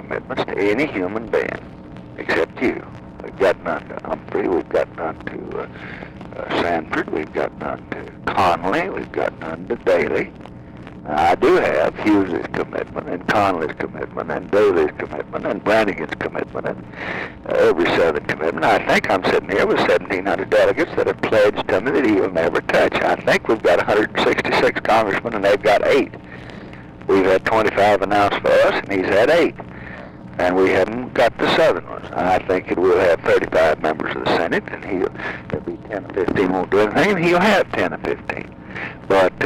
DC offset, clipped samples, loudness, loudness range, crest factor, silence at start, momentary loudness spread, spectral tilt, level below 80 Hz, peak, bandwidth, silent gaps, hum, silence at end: under 0.1%; under 0.1%; -19 LUFS; 6 LU; 10 dB; 0 s; 14 LU; -5.5 dB/octave; -46 dBFS; -10 dBFS; 16 kHz; none; none; 0 s